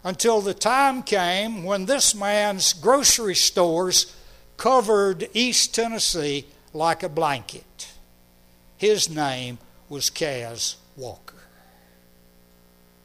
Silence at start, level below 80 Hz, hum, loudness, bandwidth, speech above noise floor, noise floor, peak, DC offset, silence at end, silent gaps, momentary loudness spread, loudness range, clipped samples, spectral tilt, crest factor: 0.05 s; -54 dBFS; 60 Hz at -55 dBFS; -21 LUFS; 15.5 kHz; 33 dB; -55 dBFS; -4 dBFS; under 0.1%; 1.9 s; none; 19 LU; 9 LU; under 0.1%; -2 dB/octave; 18 dB